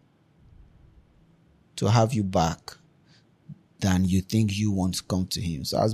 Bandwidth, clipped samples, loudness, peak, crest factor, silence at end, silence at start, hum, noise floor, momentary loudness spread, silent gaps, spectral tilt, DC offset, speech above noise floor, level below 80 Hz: 15 kHz; under 0.1%; -25 LUFS; -8 dBFS; 18 dB; 0 s; 1.75 s; none; -60 dBFS; 7 LU; none; -6 dB/octave; under 0.1%; 36 dB; -50 dBFS